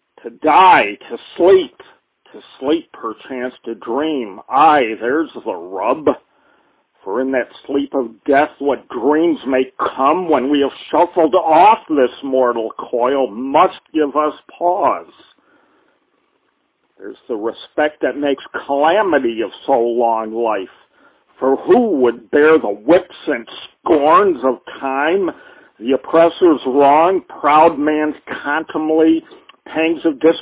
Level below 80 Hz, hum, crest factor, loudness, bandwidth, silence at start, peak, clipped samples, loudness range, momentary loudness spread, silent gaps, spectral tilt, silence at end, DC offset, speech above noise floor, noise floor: -58 dBFS; none; 16 dB; -15 LUFS; 4 kHz; 0.25 s; 0 dBFS; under 0.1%; 7 LU; 13 LU; none; -9 dB/octave; 0 s; under 0.1%; 49 dB; -64 dBFS